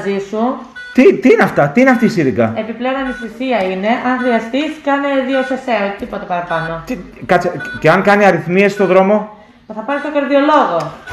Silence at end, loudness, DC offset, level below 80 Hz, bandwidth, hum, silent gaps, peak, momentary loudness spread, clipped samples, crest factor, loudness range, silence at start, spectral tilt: 0 s; -14 LUFS; under 0.1%; -48 dBFS; 13 kHz; none; none; 0 dBFS; 11 LU; under 0.1%; 14 dB; 4 LU; 0 s; -6.5 dB/octave